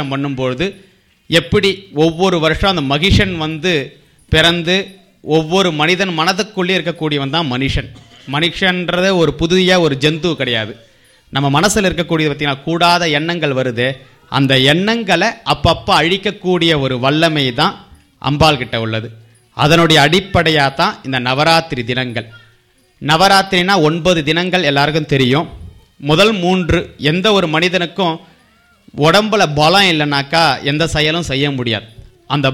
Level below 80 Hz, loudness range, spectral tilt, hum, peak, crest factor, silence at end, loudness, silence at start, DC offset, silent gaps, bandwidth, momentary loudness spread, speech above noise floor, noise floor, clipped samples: -34 dBFS; 2 LU; -5 dB/octave; none; 0 dBFS; 14 dB; 0 s; -13 LUFS; 0 s; under 0.1%; none; 16.5 kHz; 8 LU; 39 dB; -53 dBFS; under 0.1%